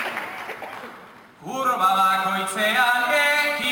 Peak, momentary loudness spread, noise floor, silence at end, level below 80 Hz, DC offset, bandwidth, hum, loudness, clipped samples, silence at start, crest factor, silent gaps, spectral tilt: -8 dBFS; 17 LU; -45 dBFS; 0 s; -70 dBFS; under 0.1%; 19 kHz; none; -20 LUFS; under 0.1%; 0 s; 16 dB; none; -2 dB/octave